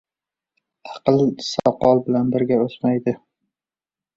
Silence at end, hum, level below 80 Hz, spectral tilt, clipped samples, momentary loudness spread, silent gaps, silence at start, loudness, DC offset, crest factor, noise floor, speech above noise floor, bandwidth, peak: 1 s; none; -56 dBFS; -7 dB/octave; under 0.1%; 8 LU; none; 0.85 s; -20 LUFS; under 0.1%; 20 dB; under -90 dBFS; over 72 dB; 7.8 kHz; -2 dBFS